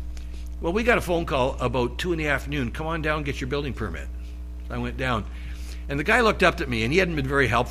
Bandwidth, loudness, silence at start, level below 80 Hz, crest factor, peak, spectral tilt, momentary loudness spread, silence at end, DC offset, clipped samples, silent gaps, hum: 15 kHz; -24 LUFS; 0 s; -34 dBFS; 20 dB; -4 dBFS; -5.5 dB/octave; 16 LU; 0 s; under 0.1%; under 0.1%; none; none